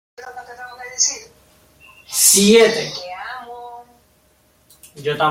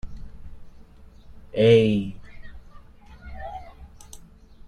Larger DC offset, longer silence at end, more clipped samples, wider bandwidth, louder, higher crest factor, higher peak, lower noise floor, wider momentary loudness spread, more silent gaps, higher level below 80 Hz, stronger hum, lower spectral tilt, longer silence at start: neither; about the same, 0 s vs 0 s; neither; first, 16.5 kHz vs 11 kHz; first, -14 LUFS vs -20 LUFS; about the same, 20 dB vs 22 dB; first, 0 dBFS vs -6 dBFS; first, -57 dBFS vs -47 dBFS; second, 25 LU vs 29 LU; neither; second, -60 dBFS vs -44 dBFS; neither; second, -2 dB/octave vs -7 dB/octave; first, 0.2 s vs 0.05 s